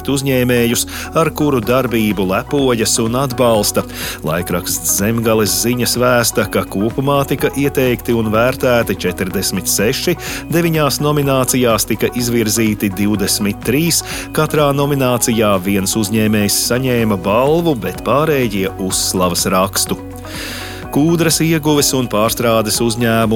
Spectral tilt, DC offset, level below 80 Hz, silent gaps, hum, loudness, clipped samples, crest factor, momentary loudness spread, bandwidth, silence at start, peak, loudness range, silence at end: -4 dB/octave; under 0.1%; -36 dBFS; none; none; -15 LUFS; under 0.1%; 14 dB; 5 LU; 17.5 kHz; 0 s; 0 dBFS; 1 LU; 0 s